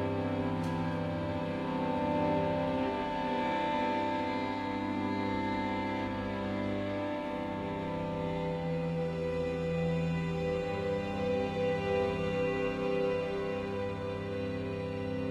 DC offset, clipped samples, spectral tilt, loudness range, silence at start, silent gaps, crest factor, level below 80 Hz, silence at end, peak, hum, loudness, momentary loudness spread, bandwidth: under 0.1%; under 0.1%; -7.5 dB/octave; 3 LU; 0 s; none; 14 dB; -54 dBFS; 0 s; -20 dBFS; none; -33 LUFS; 5 LU; 11 kHz